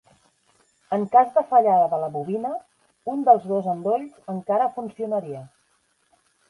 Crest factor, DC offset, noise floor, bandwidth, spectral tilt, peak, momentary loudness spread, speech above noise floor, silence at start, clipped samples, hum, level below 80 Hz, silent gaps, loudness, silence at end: 20 dB; under 0.1%; -67 dBFS; 11 kHz; -8.5 dB/octave; -4 dBFS; 15 LU; 45 dB; 0.9 s; under 0.1%; none; -74 dBFS; none; -22 LUFS; 1 s